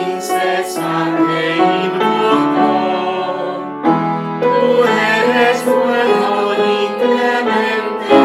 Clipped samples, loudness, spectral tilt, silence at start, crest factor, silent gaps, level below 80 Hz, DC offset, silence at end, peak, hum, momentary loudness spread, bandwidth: under 0.1%; -14 LUFS; -5 dB/octave; 0 s; 14 dB; none; -62 dBFS; under 0.1%; 0 s; 0 dBFS; none; 6 LU; 15.5 kHz